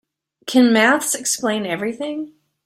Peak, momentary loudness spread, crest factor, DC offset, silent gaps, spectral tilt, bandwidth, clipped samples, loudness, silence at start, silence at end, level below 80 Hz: -2 dBFS; 17 LU; 16 dB; under 0.1%; none; -2.5 dB/octave; 15.5 kHz; under 0.1%; -18 LUFS; 0.45 s; 0.35 s; -64 dBFS